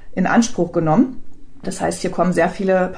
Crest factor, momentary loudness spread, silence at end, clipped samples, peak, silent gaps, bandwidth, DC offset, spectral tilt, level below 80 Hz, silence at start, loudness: 14 dB; 7 LU; 0 s; under 0.1%; -4 dBFS; none; 10 kHz; under 0.1%; -6 dB/octave; -42 dBFS; 0 s; -18 LUFS